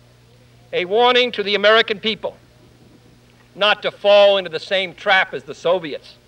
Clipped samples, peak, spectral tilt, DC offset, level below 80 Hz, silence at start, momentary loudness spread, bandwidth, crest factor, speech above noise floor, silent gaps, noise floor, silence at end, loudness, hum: under 0.1%; -2 dBFS; -3.5 dB/octave; under 0.1%; -62 dBFS; 0.7 s; 12 LU; 9.2 kHz; 16 dB; 32 dB; none; -50 dBFS; 0.3 s; -17 LUFS; 60 Hz at -55 dBFS